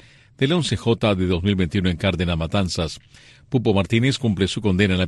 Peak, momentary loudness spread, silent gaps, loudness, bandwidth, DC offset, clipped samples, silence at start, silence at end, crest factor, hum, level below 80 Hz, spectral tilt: -6 dBFS; 5 LU; none; -21 LUFS; 11.5 kHz; under 0.1%; under 0.1%; 0.4 s; 0 s; 16 dB; none; -40 dBFS; -6 dB/octave